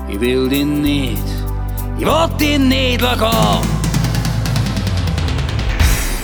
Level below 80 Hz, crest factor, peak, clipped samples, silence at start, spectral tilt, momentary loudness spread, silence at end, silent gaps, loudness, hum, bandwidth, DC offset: -22 dBFS; 14 dB; -2 dBFS; under 0.1%; 0 s; -5 dB/octave; 7 LU; 0 s; none; -16 LUFS; none; over 20 kHz; under 0.1%